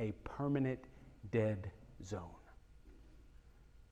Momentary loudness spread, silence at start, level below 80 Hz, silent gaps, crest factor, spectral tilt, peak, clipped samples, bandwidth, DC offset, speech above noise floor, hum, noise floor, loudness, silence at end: 20 LU; 0 s; -62 dBFS; none; 18 dB; -8 dB/octave; -24 dBFS; under 0.1%; 9.2 kHz; under 0.1%; 23 dB; none; -62 dBFS; -40 LUFS; 0.1 s